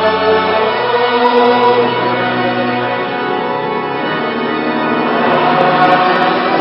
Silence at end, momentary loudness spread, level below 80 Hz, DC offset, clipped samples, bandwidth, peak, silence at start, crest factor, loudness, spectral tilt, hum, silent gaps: 0 s; 7 LU; -54 dBFS; under 0.1%; under 0.1%; 5.8 kHz; 0 dBFS; 0 s; 12 dB; -13 LUFS; -7.5 dB/octave; none; none